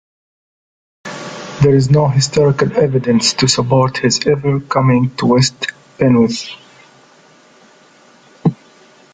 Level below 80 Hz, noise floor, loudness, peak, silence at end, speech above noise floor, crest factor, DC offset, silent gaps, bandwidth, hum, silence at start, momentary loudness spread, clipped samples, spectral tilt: -46 dBFS; -47 dBFS; -14 LUFS; 0 dBFS; 0.6 s; 34 dB; 14 dB; under 0.1%; none; 9.4 kHz; none; 1.05 s; 15 LU; under 0.1%; -5.5 dB/octave